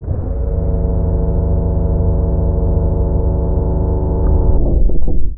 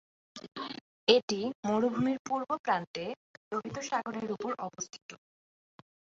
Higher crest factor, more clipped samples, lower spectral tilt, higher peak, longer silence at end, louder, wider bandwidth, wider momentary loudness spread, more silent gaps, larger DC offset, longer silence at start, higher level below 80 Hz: second, 12 dB vs 26 dB; neither; first, -17 dB/octave vs -4 dB/octave; first, -2 dBFS vs -8 dBFS; second, 0 s vs 0.95 s; first, -17 LUFS vs -33 LUFS; second, 1.7 kHz vs 7.8 kHz; second, 4 LU vs 19 LU; second, none vs 0.81-1.07 s, 1.23-1.28 s, 1.55-1.63 s, 2.19-2.25 s, 2.59-2.64 s, 2.87-2.94 s, 3.17-3.51 s, 5.02-5.09 s; neither; second, 0 s vs 0.35 s; first, -16 dBFS vs -74 dBFS